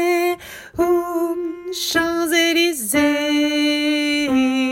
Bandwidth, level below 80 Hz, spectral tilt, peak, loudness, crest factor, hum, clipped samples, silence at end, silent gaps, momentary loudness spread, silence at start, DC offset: 16.5 kHz; -52 dBFS; -2 dB/octave; -4 dBFS; -18 LUFS; 14 dB; none; under 0.1%; 0 s; none; 8 LU; 0 s; under 0.1%